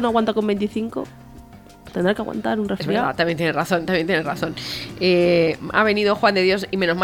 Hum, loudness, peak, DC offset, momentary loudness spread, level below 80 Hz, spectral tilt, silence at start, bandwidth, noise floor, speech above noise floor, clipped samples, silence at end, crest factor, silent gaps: none; -20 LUFS; -4 dBFS; under 0.1%; 10 LU; -50 dBFS; -6 dB/octave; 0 s; 18.5 kHz; -43 dBFS; 23 dB; under 0.1%; 0 s; 18 dB; none